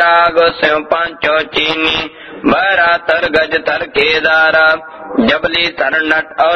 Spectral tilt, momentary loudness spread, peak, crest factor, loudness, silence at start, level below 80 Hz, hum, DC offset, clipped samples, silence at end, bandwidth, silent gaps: -4.5 dB/octave; 6 LU; 0 dBFS; 12 dB; -12 LUFS; 0 s; -44 dBFS; none; under 0.1%; under 0.1%; 0 s; 7.2 kHz; none